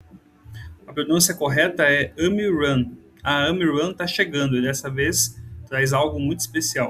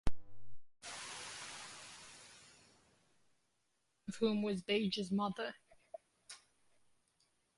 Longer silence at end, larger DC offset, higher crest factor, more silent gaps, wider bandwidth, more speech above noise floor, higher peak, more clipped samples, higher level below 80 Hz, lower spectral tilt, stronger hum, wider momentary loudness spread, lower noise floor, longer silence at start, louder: second, 0 s vs 1.2 s; neither; about the same, 18 dB vs 20 dB; neither; first, 15.5 kHz vs 11.5 kHz; second, 26 dB vs 46 dB; first, -4 dBFS vs -20 dBFS; neither; first, -50 dBFS vs -56 dBFS; about the same, -3.5 dB/octave vs -4.5 dB/octave; neither; second, 12 LU vs 21 LU; second, -47 dBFS vs -83 dBFS; about the same, 0.15 s vs 0.05 s; first, -21 LUFS vs -40 LUFS